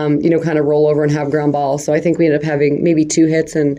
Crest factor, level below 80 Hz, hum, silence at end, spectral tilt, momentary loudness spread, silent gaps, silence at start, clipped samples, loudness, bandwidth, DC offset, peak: 12 dB; -52 dBFS; none; 0 s; -6.5 dB/octave; 3 LU; none; 0 s; under 0.1%; -14 LUFS; 12 kHz; under 0.1%; -2 dBFS